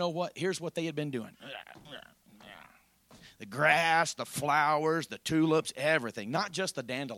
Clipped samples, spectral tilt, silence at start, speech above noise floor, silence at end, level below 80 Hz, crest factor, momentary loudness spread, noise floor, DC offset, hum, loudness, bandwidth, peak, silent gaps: under 0.1%; -4 dB/octave; 0 s; 30 dB; 0 s; -72 dBFS; 20 dB; 22 LU; -61 dBFS; under 0.1%; none; -30 LUFS; 16.5 kHz; -12 dBFS; none